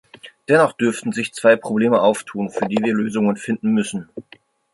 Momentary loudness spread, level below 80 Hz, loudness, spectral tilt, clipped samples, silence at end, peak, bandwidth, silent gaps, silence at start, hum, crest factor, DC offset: 11 LU; -64 dBFS; -19 LUFS; -5.5 dB/octave; under 0.1%; 0.5 s; -2 dBFS; 11.5 kHz; none; 0.25 s; none; 18 dB; under 0.1%